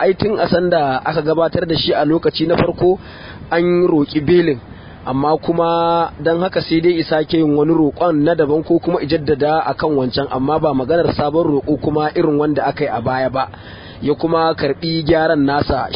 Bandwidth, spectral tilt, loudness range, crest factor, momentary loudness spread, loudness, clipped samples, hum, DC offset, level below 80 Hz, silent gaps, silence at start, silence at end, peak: 5.4 kHz; -11.5 dB/octave; 2 LU; 16 dB; 5 LU; -16 LUFS; under 0.1%; none; under 0.1%; -40 dBFS; none; 0 s; 0 s; 0 dBFS